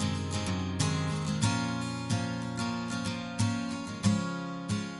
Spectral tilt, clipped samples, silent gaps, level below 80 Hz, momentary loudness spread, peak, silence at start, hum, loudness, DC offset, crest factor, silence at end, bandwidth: -5 dB/octave; under 0.1%; none; -58 dBFS; 5 LU; -12 dBFS; 0 s; none; -32 LUFS; under 0.1%; 18 dB; 0 s; 11.5 kHz